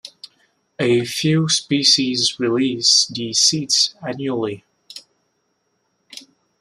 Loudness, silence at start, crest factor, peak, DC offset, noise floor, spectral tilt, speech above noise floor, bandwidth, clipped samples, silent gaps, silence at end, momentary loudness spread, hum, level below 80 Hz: -17 LUFS; 0.05 s; 20 dB; 0 dBFS; under 0.1%; -69 dBFS; -3 dB/octave; 51 dB; 15 kHz; under 0.1%; none; 0.4 s; 24 LU; none; -64 dBFS